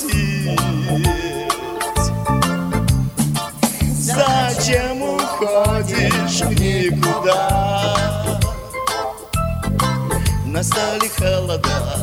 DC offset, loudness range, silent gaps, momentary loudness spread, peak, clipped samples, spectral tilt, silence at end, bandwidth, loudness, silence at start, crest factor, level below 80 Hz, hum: under 0.1%; 3 LU; none; 5 LU; -2 dBFS; under 0.1%; -4.5 dB/octave; 0 s; 17 kHz; -18 LUFS; 0 s; 16 dB; -30 dBFS; none